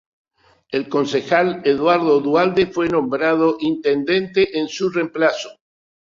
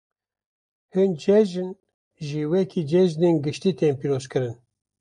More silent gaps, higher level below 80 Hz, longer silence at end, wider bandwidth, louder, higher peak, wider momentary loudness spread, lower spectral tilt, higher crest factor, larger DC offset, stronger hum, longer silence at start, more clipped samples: second, none vs 1.94-2.11 s; first, -56 dBFS vs -66 dBFS; about the same, 0.5 s vs 0.5 s; second, 7.6 kHz vs 10 kHz; first, -18 LUFS vs -23 LUFS; first, -2 dBFS vs -8 dBFS; second, 6 LU vs 12 LU; second, -5.5 dB/octave vs -7.5 dB/octave; about the same, 16 dB vs 16 dB; neither; neither; second, 0.7 s vs 0.95 s; neither